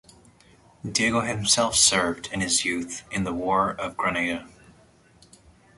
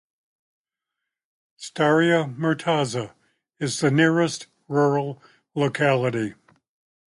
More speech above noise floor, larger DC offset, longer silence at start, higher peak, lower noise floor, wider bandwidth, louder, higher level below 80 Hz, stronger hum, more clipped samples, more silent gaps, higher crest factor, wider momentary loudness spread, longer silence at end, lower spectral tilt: second, 32 dB vs 63 dB; neither; second, 0.85 s vs 1.6 s; about the same, -6 dBFS vs -6 dBFS; second, -56 dBFS vs -85 dBFS; about the same, 12 kHz vs 11.5 kHz; about the same, -23 LUFS vs -22 LUFS; first, -52 dBFS vs -66 dBFS; neither; neither; neither; about the same, 22 dB vs 18 dB; second, 12 LU vs 15 LU; first, 1.3 s vs 0.8 s; second, -2 dB/octave vs -5.5 dB/octave